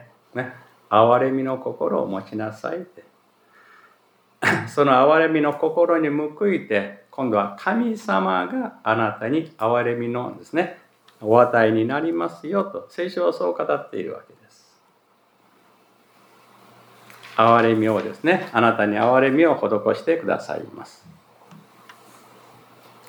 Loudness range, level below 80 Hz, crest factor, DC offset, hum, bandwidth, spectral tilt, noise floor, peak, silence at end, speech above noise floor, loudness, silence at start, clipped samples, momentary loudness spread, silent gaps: 9 LU; -80 dBFS; 20 dB; under 0.1%; none; 20 kHz; -7 dB/octave; -61 dBFS; -2 dBFS; 2.2 s; 40 dB; -21 LUFS; 0.35 s; under 0.1%; 15 LU; none